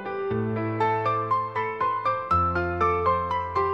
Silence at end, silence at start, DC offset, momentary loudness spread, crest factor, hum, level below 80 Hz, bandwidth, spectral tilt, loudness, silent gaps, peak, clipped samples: 0 s; 0 s; 0.1%; 5 LU; 14 dB; none; -52 dBFS; 8 kHz; -8 dB/octave; -25 LUFS; none; -10 dBFS; under 0.1%